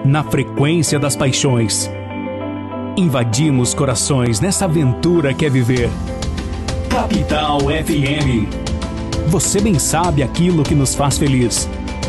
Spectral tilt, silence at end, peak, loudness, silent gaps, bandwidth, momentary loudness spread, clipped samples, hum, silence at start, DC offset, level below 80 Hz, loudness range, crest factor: -5 dB/octave; 0 s; -6 dBFS; -16 LUFS; none; 12.5 kHz; 9 LU; under 0.1%; none; 0 s; under 0.1%; -30 dBFS; 2 LU; 10 dB